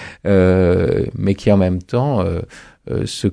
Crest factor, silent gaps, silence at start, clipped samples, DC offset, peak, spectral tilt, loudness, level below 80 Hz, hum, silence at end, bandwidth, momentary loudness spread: 14 dB; none; 0 s; under 0.1%; under 0.1%; -2 dBFS; -7.5 dB/octave; -17 LUFS; -38 dBFS; none; 0 s; 11 kHz; 11 LU